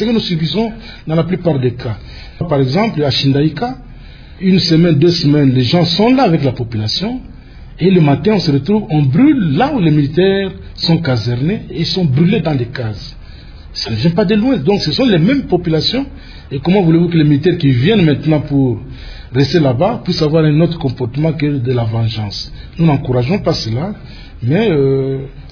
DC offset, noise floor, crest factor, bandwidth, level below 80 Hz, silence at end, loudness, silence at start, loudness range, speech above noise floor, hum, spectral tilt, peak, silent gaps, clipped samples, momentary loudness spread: under 0.1%; -33 dBFS; 12 dB; 5.4 kHz; -36 dBFS; 0 s; -13 LUFS; 0 s; 4 LU; 20 dB; none; -7.5 dB/octave; 0 dBFS; none; under 0.1%; 12 LU